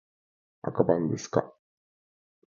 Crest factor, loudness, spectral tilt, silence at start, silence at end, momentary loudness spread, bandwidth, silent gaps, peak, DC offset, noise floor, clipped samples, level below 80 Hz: 26 dB; -28 LUFS; -7 dB/octave; 0.65 s; 1 s; 13 LU; 7.4 kHz; none; -6 dBFS; under 0.1%; under -90 dBFS; under 0.1%; -64 dBFS